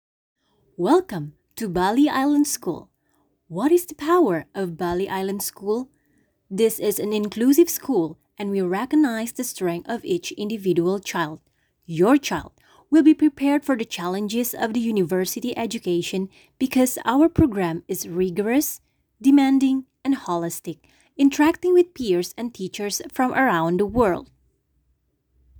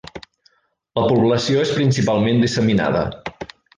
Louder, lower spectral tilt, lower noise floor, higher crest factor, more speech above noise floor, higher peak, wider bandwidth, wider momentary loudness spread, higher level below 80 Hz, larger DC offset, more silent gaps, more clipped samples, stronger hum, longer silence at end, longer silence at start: second, -22 LUFS vs -18 LUFS; about the same, -5 dB/octave vs -6 dB/octave; first, -68 dBFS vs -60 dBFS; first, 20 dB vs 14 dB; first, 47 dB vs 43 dB; about the same, -2 dBFS vs -4 dBFS; first, over 20 kHz vs 9.8 kHz; second, 12 LU vs 16 LU; second, -52 dBFS vs -46 dBFS; neither; neither; neither; neither; first, 1.35 s vs 0.35 s; first, 0.8 s vs 0.15 s